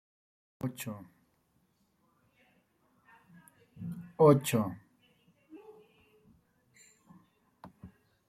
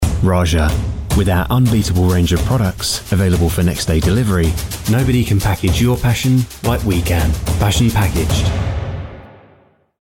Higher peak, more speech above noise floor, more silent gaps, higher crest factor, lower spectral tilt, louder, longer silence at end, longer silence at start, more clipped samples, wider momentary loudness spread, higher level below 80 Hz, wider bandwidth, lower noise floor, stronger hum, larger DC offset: second, -10 dBFS vs -4 dBFS; first, 46 dB vs 37 dB; neither; first, 26 dB vs 12 dB; about the same, -6.5 dB/octave vs -5.5 dB/octave; second, -30 LUFS vs -16 LUFS; second, 0.4 s vs 0.75 s; first, 0.65 s vs 0 s; neither; first, 30 LU vs 5 LU; second, -72 dBFS vs -24 dBFS; about the same, 15.5 kHz vs 17 kHz; first, -73 dBFS vs -51 dBFS; neither; neither